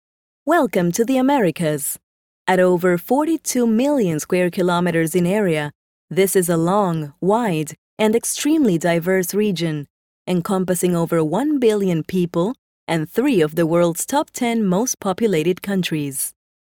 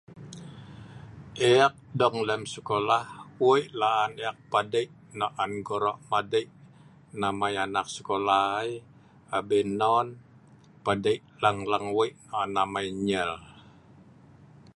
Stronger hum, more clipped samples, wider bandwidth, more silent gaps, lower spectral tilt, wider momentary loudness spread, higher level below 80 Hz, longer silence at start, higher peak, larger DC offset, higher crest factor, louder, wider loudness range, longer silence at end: neither; neither; first, 18 kHz vs 11.5 kHz; first, 2.03-2.45 s, 5.75-6.08 s, 7.78-7.97 s, 9.90-10.25 s, 12.58-12.87 s vs none; about the same, -5.5 dB/octave vs -4.5 dB/octave; second, 7 LU vs 20 LU; about the same, -60 dBFS vs -62 dBFS; first, 0.45 s vs 0.1 s; first, -2 dBFS vs -6 dBFS; neither; second, 16 dB vs 22 dB; first, -19 LUFS vs -27 LUFS; second, 1 LU vs 4 LU; second, 0.4 s vs 1.15 s